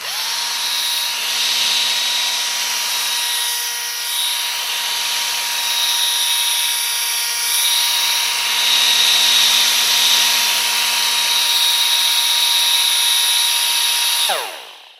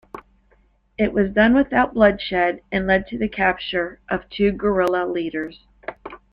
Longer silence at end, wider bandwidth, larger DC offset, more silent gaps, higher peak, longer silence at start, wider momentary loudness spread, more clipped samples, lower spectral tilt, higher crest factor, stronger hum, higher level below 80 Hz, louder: about the same, 0.2 s vs 0.15 s; first, 16.5 kHz vs 6.6 kHz; neither; neither; first, 0 dBFS vs -4 dBFS; second, 0 s vs 0.15 s; second, 7 LU vs 20 LU; neither; second, 4 dB/octave vs -7.5 dB/octave; about the same, 16 dB vs 18 dB; neither; second, -78 dBFS vs -44 dBFS; first, -14 LUFS vs -20 LUFS